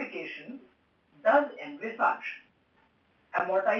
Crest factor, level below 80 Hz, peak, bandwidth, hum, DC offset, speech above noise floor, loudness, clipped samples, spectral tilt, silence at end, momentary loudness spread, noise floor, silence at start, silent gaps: 20 dB; -82 dBFS; -10 dBFS; 6.8 kHz; none; under 0.1%; 40 dB; -30 LUFS; under 0.1%; -5.5 dB/octave; 0 s; 20 LU; -67 dBFS; 0 s; none